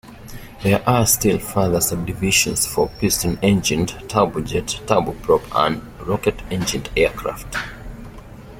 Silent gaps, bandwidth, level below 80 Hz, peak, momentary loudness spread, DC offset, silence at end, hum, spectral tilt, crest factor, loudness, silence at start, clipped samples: none; 16.5 kHz; -38 dBFS; 0 dBFS; 12 LU; under 0.1%; 0 s; none; -4 dB/octave; 20 dB; -19 LUFS; 0.05 s; under 0.1%